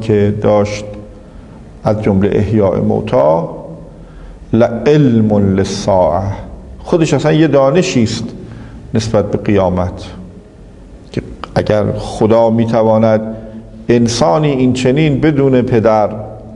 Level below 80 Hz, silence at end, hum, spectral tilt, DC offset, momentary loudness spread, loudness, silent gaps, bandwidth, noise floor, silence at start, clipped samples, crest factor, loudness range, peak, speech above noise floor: -36 dBFS; 0 s; none; -7 dB/octave; under 0.1%; 18 LU; -12 LUFS; none; 11 kHz; -36 dBFS; 0 s; under 0.1%; 12 dB; 5 LU; 0 dBFS; 24 dB